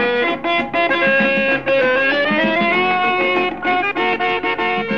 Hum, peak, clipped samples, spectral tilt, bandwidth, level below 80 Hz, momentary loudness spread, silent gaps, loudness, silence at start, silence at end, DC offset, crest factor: none; -6 dBFS; under 0.1%; -6 dB/octave; 7 kHz; -50 dBFS; 4 LU; none; -16 LUFS; 0 s; 0 s; 0.7%; 12 dB